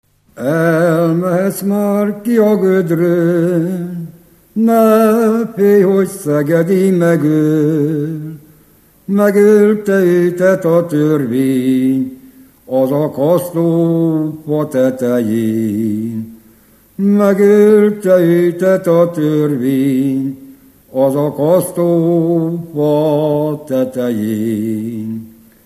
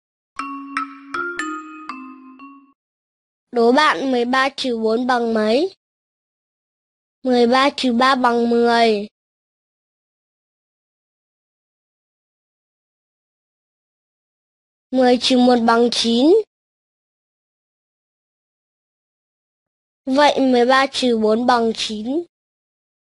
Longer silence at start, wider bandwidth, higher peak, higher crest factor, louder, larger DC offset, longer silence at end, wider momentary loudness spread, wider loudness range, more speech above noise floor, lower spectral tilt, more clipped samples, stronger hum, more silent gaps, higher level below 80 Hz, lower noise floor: about the same, 0.35 s vs 0.4 s; first, 15 kHz vs 11.5 kHz; about the same, 0 dBFS vs 0 dBFS; second, 12 dB vs 20 dB; first, -13 LUFS vs -17 LUFS; neither; second, 0.35 s vs 0.9 s; second, 10 LU vs 16 LU; second, 4 LU vs 7 LU; first, 36 dB vs 26 dB; first, -8 dB/octave vs -3.5 dB/octave; neither; neither; second, none vs 2.75-3.47 s, 5.77-7.22 s, 9.11-14.90 s, 16.47-20.04 s; about the same, -58 dBFS vs -62 dBFS; first, -48 dBFS vs -42 dBFS